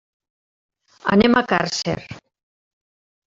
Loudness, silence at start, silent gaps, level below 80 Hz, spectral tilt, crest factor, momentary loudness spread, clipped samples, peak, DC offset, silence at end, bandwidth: -19 LUFS; 1.05 s; none; -52 dBFS; -5 dB/octave; 20 dB; 14 LU; under 0.1%; -2 dBFS; under 0.1%; 1.2 s; 7.8 kHz